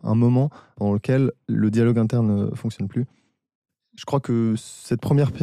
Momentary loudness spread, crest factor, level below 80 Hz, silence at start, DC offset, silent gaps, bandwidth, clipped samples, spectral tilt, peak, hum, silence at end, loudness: 10 LU; 12 dB; -56 dBFS; 0.05 s; under 0.1%; 3.55-3.62 s; 12.5 kHz; under 0.1%; -8.5 dB/octave; -8 dBFS; none; 0 s; -22 LUFS